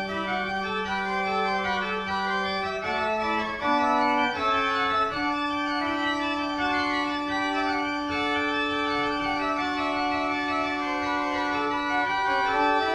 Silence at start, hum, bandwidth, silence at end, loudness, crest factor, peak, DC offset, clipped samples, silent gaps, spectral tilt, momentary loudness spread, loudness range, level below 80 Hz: 0 s; none; 11 kHz; 0 s; -26 LUFS; 14 dB; -12 dBFS; under 0.1%; under 0.1%; none; -4 dB/octave; 4 LU; 2 LU; -52 dBFS